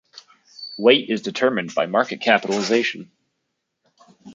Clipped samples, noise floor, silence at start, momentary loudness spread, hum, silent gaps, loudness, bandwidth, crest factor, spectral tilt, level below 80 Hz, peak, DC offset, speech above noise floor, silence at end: under 0.1%; -76 dBFS; 0.15 s; 13 LU; none; none; -20 LUFS; 7.6 kHz; 20 dB; -4 dB/octave; -70 dBFS; -2 dBFS; under 0.1%; 57 dB; 0 s